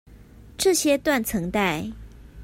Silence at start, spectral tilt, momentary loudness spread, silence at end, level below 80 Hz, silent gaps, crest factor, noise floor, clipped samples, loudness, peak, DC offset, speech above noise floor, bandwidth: 0.1 s; -3.5 dB/octave; 18 LU; 0 s; -46 dBFS; none; 16 dB; -47 dBFS; under 0.1%; -23 LUFS; -8 dBFS; under 0.1%; 24 dB; 16.5 kHz